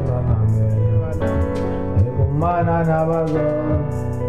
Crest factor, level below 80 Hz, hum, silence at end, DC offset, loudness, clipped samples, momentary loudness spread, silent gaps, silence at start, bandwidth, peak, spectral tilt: 12 dB; -30 dBFS; none; 0 s; 2%; -19 LUFS; under 0.1%; 4 LU; none; 0 s; 7.2 kHz; -8 dBFS; -10 dB/octave